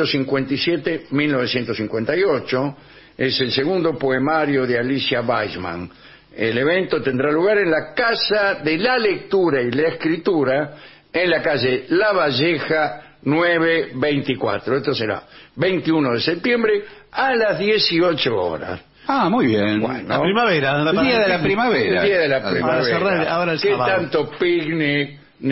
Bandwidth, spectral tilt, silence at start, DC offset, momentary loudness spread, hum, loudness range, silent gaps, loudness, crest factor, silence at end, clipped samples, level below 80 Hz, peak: 6 kHz; -8.5 dB/octave; 0 s; under 0.1%; 6 LU; none; 3 LU; none; -19 LUFS; 14 dB; 0 s; under 0.1%; -54 dBFS; -4 dBFS